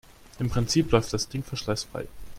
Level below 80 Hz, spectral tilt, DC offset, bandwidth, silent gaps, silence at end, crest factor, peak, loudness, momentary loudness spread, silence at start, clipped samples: -44 dBFS; -5 dB/octave; under 0.1%; 16 kHz; none; 0 s; 24 dB; -4 dBFS; -27 LUFS; 11 LU; 0.1 s; under 0.1%